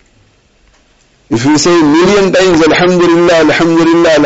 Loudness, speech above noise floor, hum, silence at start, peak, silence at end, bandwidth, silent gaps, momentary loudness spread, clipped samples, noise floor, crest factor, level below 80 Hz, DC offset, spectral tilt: -7 LUFS; 42 dB; none; 1.3 s; 0 dBFS; 0 s; 8 kHz; none; 2 LU; under 0.1%; -49 dBFS; 8 dB; -38 dBFS; under 0.1%; -5 dB/octave